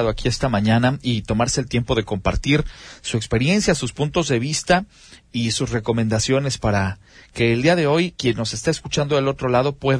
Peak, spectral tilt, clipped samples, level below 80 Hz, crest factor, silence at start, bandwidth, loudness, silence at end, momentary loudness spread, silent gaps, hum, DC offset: -4 dBFS; -5 dB/octave; under 0.1%; -36 dBFS; 16 dB; 0 s; 10.5 kHz; -20 LUFS; 0 s; 7 LU; none; none; under 0.1%